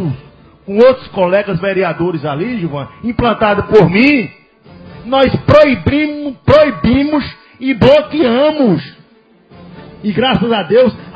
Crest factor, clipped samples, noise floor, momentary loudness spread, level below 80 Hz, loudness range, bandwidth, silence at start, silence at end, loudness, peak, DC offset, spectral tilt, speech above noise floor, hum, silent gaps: 12 dB; 0.5%; -47 dBFS; 12 LU; -34 dBFS; 3 LU; 8 kHz; 0 s; 0.05 s; -12 LUFS; 0 dBFS; under 0.1%; -8 dB/octave; 36 dB; none; none